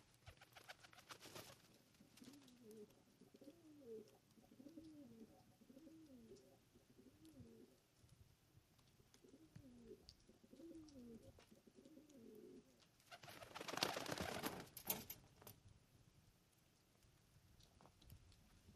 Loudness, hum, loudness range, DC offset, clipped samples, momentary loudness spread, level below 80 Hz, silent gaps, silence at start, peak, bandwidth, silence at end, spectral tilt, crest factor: -54 LUFS; none; 18 LU; under 0.1%; under 0.1%; 20 LU; -78 dBFS; none; 0 s; -20 dBFS; 15 kHz; 0 s; -3 dB/octave; 38 dB